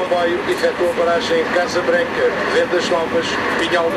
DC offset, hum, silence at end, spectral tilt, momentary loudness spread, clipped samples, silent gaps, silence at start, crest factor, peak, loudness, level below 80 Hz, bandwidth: under 0.1%; none; 0 s; -4 dB/octave; 2 LU; under 0.1%; none; 0 s; 14 dB; -2 dBFS; -17 LUFS; -50 dBFS; 14 kHz